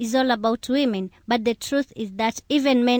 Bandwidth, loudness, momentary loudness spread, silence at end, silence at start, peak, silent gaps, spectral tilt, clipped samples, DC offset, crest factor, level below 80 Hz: 20 kHz; -23 LUFS; 6 LU; 0 s; 0 s; -8 dBFS; none; -4 dB/octave; under 0.1%; under 0.1%; 14 dB; -58 dBFS